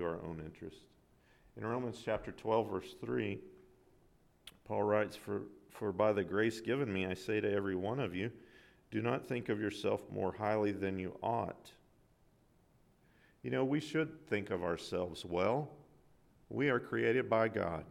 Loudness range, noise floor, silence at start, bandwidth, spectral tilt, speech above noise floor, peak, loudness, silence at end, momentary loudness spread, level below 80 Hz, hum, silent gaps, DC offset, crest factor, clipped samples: 4 LU; -69 dBFS; 0 s; 15.5 kHz; -6.5 dB/octave; 33 dB; -18 dBFS; -37 LUFS; 0 s; 12 LU; -68 dBFS; none; none; under 0.1%; 20 dB; under 0.1%